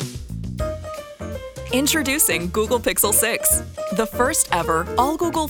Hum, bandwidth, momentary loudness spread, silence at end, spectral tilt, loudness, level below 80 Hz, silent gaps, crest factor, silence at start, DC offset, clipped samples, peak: none; over 20 kHz; 16 LU; 0 s; -3 dB/octave; -19 LUFS; -38 dBFS; none; 20 dB; 0 s; under 0.1%; under 0.1%; 0 dBFS